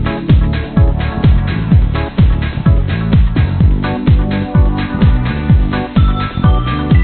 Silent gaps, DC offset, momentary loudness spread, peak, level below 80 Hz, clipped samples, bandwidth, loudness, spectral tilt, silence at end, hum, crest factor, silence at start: none; under 0.1%; 2 LU; 0 dBFS; -14 dBFS; under 0.1%; 4.5 kHz; -13 LUFS; -12.5 dB/octave; 0 s; none; 10 dB; 0 s